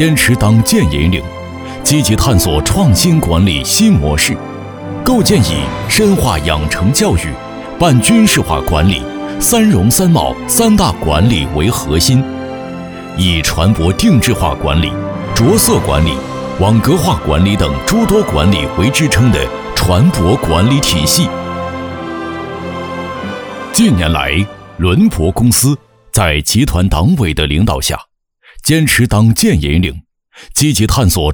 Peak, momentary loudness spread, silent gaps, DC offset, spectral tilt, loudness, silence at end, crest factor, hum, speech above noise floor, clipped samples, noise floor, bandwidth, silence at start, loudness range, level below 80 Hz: 0 dBFS; 12 LU; none; under 0.1%; -4.5 dB/octave; -12 LUFS; 0 s; 12 dB; none; 34 dB; under 0.1%; -45 dBFS; over 20 kHz; 0 s; 3 LU; -24 dBFS